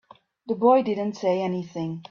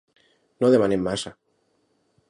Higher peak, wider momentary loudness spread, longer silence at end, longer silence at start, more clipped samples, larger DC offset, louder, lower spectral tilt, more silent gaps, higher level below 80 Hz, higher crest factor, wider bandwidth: about the same, -6 dBFS vs -6 dBFS; about the same, 13 LU vs 12 LU; second, 0.1 s vs 1 s; second, 0.45 s vs 0.6 s; neither; neither; about the same, -24 LUFS vs -22 LUFS; first, -7.5 dB/octave vs -6 dB/octave; neither; second, -70 dBFS vs -56 dBFS; about the same, 18 dB vs 18 dB; second, 7.2 kHz vs 11.5 kHz